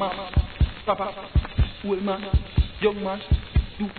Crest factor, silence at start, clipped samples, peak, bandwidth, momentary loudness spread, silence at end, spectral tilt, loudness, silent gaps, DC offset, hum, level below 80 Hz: 14 dB; 0 s; under 0.1%; -10 dBFS; 4.5 kHz; 3 LU; 0 s; -10.5 dB/octave; -26 LUFS; none; 0.2%; none; -28 dBFS